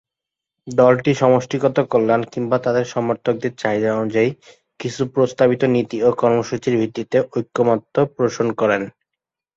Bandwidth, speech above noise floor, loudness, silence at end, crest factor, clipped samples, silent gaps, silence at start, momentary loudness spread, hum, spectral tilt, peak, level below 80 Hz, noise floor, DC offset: 7.8 kHz; 68 dB; -19 LUFS; 0.65 s; 18 dB; under 0.1%; none; 0.65 s; 7 LU; none; -6.5 dB/octave; -2 dBFS; -58 dBFS; -85 dBFS; under 0.1%